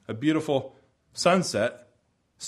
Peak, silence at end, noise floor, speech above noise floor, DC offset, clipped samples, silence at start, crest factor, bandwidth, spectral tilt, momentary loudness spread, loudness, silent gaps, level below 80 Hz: -6 dBFS; 0 s; -69 dBFS; 44 dB; under 0.1%; under 0.1%; 0.1 s; 20 dB; 13.5 kHz; -4.5 dB/octave; 14 LU; -26 LUFS; none; -66 dBFS